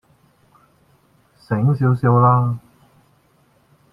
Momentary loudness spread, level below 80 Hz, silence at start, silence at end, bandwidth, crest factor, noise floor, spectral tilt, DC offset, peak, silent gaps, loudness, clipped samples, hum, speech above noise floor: 11 LU; -56 dBFS; 1.5 s; 1.35 s; 5.2 kHz; 18 dB; -58 dBFS; -11 dB/octave; under 0.1%; -2 dBFS; none; -17 LUFS; under 0.1%; none; 43 dB